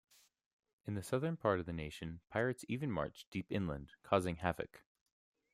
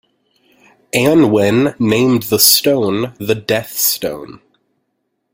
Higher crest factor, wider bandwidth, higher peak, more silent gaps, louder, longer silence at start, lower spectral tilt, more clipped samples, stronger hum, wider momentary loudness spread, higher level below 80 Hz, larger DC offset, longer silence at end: first, 24 dB vs 16 dB; about the same, 15.5 kHz vs 17 kHz; second, -16 dBFS vs 0 dBFS; first, 3.27-3.32 s vs none; second, -40 LUFS vs -13 LUFS; about the same, 0.85 s vs 0.95 s; first, -6.5 dB/octave vs -4 dB/octave; neither; neither; about the same, 10 LU vs 11 LU; second, -62 dBFS vs -52 dBFS; neither; second, 0.75 s vs 1 s